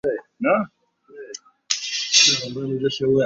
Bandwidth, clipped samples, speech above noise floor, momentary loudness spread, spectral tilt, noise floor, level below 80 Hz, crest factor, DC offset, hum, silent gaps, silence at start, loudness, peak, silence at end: 7.8 kHz; under 0.1%; 21 dB; 23 LU; -2 dB/octave; -43 dBFS; -62 dBFS; 22 dB; under 0.1%; none; none; 0.05 s; -19 LUFS; 0 dBFS; 0 s